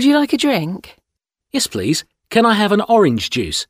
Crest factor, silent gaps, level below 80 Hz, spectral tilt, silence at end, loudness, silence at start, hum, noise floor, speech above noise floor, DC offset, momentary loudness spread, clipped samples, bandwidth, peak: 14 dB; none; -48 dBFS; -4.5 dB/octave; 0.05 s; -16 LUFS; 0 s; none; -79 dBFS; 64 dB; under 0.1%; 9 LU; under 0.1%; 16 kHz; -2 dBFS